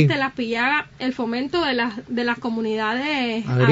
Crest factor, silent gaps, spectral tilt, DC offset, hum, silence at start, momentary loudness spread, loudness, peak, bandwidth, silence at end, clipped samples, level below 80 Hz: 18 dB; none; -7 dB/octave; under 0.1%; none; 0 s; 5 LU; -22 LUFS; -4 dBFS; 7.8 kHz; 0 s; under 0.1%; -56 dBFS